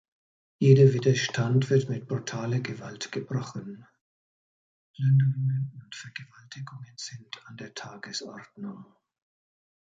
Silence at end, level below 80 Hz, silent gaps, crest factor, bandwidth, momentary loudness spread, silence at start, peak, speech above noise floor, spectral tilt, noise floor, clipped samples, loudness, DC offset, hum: 0.95 s; -68 dBFS; 4.01-4.94 s; 22 dB; 7.8 kHz; 21 LU; 0.6 s; -6 dBFS; over 63 dB; -6.5 dB/octave; under -90 dBFS; under 0.1%; -26 LUFS; under 0.1%; none